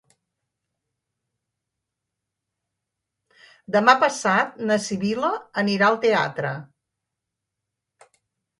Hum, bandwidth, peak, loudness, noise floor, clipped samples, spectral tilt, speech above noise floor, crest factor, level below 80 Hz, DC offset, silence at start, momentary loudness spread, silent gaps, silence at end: none; 11.5 kHz; -2 dBFS; -21 LUFS; -83 dBFS; under 0.1%; -4.5 dB/octave; 62 dB; 24 dB; -72 dBFS; under 0.1%; 3.7 s; 9 LU; none; 1.95 s